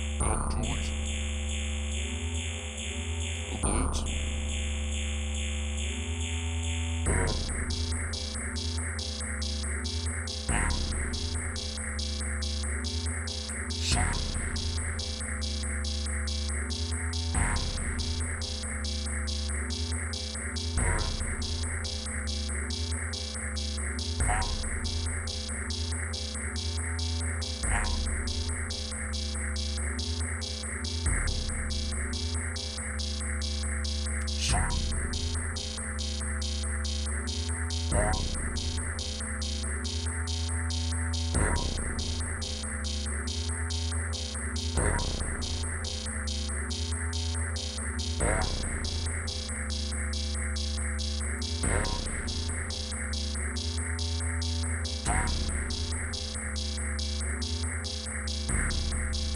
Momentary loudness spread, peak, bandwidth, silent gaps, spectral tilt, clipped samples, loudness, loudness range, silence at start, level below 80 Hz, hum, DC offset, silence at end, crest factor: 4 LU; -14 dBFS; 10.5 kHz; none; -3.5 dB/octave; under 0.1%; -32 LUFS; 1 LU; 0 s; -34 dBFS; none; under 0.1%; 0 s; 18 dB